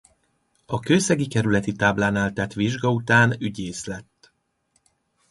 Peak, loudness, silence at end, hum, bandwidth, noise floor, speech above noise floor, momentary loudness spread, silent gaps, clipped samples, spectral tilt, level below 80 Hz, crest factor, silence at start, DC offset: -4 dBFS; -22 LUFS; 1.3 s; none; 11.5 kHz; -69 dBFS; 47 dB; 13 LU; none; under 0.1%; -5 dB/octave; -52 dBFS; 20 dB; 0.7 s; under 0.1%